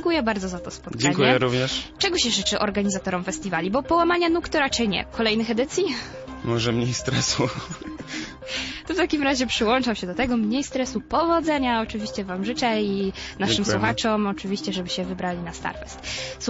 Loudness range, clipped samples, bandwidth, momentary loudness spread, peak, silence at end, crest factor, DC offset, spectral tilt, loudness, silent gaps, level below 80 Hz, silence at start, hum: 3 LU; under 0.1%; 8 kHz; 11 LU; -6 dBFS; 0 s; 18 dB; under 0.1%; -4 dB/octave; -24 LUFS; none; -46 dBFS; 0 s; none